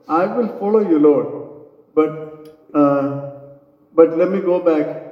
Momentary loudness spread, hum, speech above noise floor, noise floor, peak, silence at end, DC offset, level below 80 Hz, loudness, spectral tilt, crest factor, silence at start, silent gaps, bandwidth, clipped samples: 18 LU; none; 30 dB; -46 dBFS; 0 dBFS; 0 s; under 0.1%; -68 dBFS; -17 LUFS; -10 dB/octave; 18 dB; 0.1 s; none; 5.6 kHz; under 0.1%